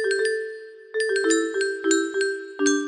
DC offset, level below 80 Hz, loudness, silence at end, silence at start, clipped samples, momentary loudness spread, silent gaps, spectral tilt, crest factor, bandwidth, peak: under 0.1%; -72 dBFS; -24 LUFS; 0 s; 0 s; under 0.1%; 10 LU; none; -0.5 dB/octave; 16 dB; 12.5 kHz; -8 dBFS